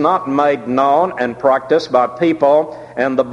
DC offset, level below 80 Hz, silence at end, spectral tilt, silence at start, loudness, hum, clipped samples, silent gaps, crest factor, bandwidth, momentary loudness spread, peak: under 0.1%; -58 dBFS; 0 s; -6.5 dB/octave; 0 s; -15 LUFS; none; under 0.1%; none; 14 dB; 10.5 kHz; 5 LU; 0 dBFS